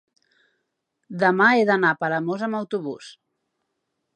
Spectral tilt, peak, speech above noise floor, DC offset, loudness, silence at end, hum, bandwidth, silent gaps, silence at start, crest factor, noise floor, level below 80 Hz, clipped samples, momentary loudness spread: -6.5 dB/octave; -4 dBFS; 56 dB; under 0.1%; -21 LUFS; 1.05 s; none; 10 kHz; none; 1.1 s; 20 dB; -77 dBFS; -78 dBFS; under 0.1%; 17 LU